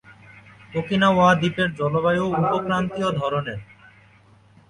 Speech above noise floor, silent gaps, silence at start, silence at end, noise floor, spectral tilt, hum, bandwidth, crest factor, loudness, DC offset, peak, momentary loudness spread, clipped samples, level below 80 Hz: 33 dB; none; 0.1 s; 1.05 s; -53 dBFS; -6.5 dB/octave; none; 10.5 kHz; 18 dB; -21 LUFS; under 0.1%; -6 dBFS; 13 LU; under 0.1%; -52 dBFS